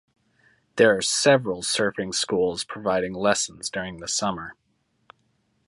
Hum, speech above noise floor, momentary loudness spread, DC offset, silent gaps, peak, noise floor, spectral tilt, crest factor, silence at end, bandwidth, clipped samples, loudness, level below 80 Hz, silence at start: none; 45 dB; 11 LU; under 0.1%; none; -4 dBFS; -69 dBFS; -3 dB/octave; 20 dB; 1.15 s; 11.5 kHz; under 0.1%; -23 LUFS; -58 dBFS; 0.75 s